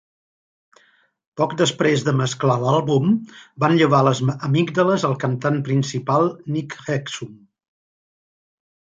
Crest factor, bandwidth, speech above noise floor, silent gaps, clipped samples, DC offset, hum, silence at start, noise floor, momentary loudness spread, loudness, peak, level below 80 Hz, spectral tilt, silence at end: 18 dB; 9.2 kHz; 40 dB; none; under 0.1%; under 0.1%; none; 1.35 s; -59 dBFS; 10 LU; -20 LUFS; -2 dBFS; -62 dBFS; -6 dB/octave; 1.55 s